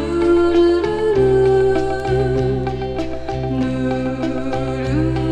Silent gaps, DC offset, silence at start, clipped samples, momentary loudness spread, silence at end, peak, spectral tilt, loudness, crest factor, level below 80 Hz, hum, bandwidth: none; under 0.1%; 0 s; under 0.1%; 9 LU; 0 s; -6 dBFS; -8 dB/octave; -18 LUFS; 12 dB; -32 dBFS; none; 9.4 kHz